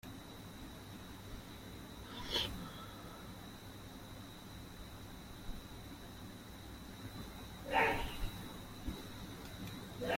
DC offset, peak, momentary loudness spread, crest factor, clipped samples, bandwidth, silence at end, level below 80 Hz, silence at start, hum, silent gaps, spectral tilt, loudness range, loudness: under 0.1%; -20 dBFS; 14 LU; 24 dB; under 0.1%; 16.5 kHz; 0 s; -54 dBFS; 0.05 s; none; none; -4 dB/octave; 10 LU; -44 LUFS